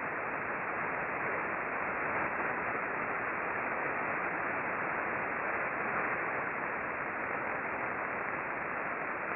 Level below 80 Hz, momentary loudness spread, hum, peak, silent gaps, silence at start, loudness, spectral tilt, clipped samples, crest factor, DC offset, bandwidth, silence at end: -66 dBFS; 3 LU; none; -20 dBFS; none; 0 s; -34 LUFS; -9 dB/octave; under 0.1%; 16 dB; under 0.1%; 4.3 kHz; 0 s